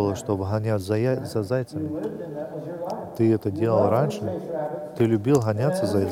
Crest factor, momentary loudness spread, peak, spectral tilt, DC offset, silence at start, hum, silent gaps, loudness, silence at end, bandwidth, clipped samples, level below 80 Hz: 16 dB; 11 LU; -8 dBFS; -7.5 dB/octave; under 0.1%; 0 s; none; none; -25 LUFS; 0 s; 16 kHz; under 0.1%; -60 dBFS